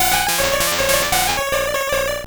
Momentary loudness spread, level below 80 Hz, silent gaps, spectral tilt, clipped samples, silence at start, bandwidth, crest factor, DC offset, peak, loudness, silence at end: 4 LU; -36 dBFS; none; -1 dB/octave; under 0.1%; 0 s; over 20 kHz; 14 dB; under 0.1%; -4 dBFS; -17 LUFS; 0 s